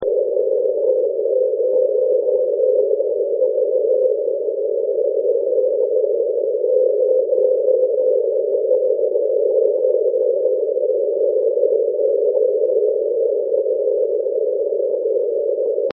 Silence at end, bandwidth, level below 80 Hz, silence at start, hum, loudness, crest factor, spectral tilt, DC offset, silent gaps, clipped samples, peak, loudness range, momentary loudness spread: 0 s; 1.2 kHz; -72 dBFS; 0 s; none; -18 LUFS; 12 dB; -7 dB/octave; under 0.1%; none; under 0.1%; -4 dBFS; 1 LU; 3 LU